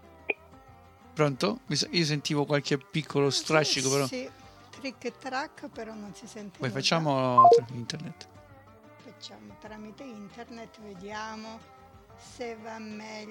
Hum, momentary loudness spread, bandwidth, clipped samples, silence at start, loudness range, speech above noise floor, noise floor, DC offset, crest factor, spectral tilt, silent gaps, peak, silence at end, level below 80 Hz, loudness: none; 21 LU; 17 kHz; under 0.1%; 0.3 s; 17 LU; 25 dB; -53 dBFS; under 0.1%; 24 dB; -4 dB/octave; none; -6 dBFS; 0 s; -66 dBFS; -27 LUFS